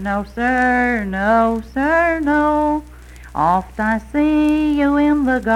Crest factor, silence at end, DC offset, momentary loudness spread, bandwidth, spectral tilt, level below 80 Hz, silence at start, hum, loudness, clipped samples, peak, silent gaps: 12 dB; 0 s; under 0.1%; 5 LU; 11.5 kHz; -7 dB/octave; -36 dBFS; 0 s; none; -17 LUFS; under 0.1%; -4 dBFS; none